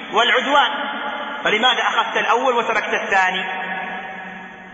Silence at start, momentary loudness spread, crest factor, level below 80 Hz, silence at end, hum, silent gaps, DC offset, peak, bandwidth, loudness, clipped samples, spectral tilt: 0 s; 13 LU; 16 dB; -64 dBFS; 0 s; none; none; under 0.1%; -4 dBFS; 8 kHz; -18 LUFS; under 0.1%; -2.5 dB/octave